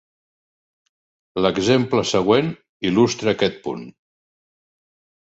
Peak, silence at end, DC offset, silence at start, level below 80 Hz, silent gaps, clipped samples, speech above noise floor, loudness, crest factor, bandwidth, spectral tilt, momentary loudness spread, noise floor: -2 dBFS; 1.3 s; under 0.1%; 1.35 s; -54 dBFS; 2.69-2.80 s; under 0.1%; over 71 dB; -19 LUFS; 20 dB; 8.2 kHz; -5 dB/octave; 13 LU; under -90 dBFS